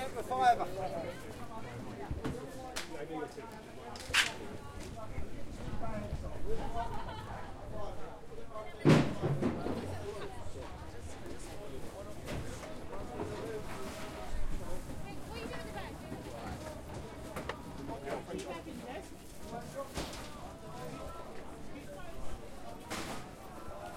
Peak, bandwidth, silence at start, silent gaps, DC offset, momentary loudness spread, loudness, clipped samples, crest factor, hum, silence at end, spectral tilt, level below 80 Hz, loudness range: -12 dBFS; 16.5 kHz; 0 s; none; under 0.1%; 15 LU; -39 LUFS; under 0.1%; 26 dB; none; 0 s; -5 dB/octave; -48 dBFS; 10 LU